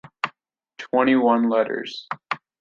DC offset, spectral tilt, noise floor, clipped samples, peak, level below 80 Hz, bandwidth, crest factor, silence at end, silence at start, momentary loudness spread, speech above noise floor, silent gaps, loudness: under 0.1%; -6 dB/octave; -62 dBFS; under 0.1%; -4 dBFS; -68 dBFS; 7.4 kHz; 18 dB; 0.25 s; 0.05 s; 14 LU; 42 dB; none; -22 LUFS